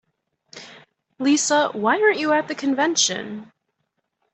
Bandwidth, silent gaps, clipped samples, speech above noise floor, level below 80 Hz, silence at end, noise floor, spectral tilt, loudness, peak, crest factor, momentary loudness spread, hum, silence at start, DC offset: 8.4 kHz; none; under 0.1%; 55 dB; -72 dBFS; 0.9 s; -75 dBFS; -2 dB/octave; -20 LUFS; -6 dBFS; 18 dB; 20 LU; none; 0.55 s; under 0.1%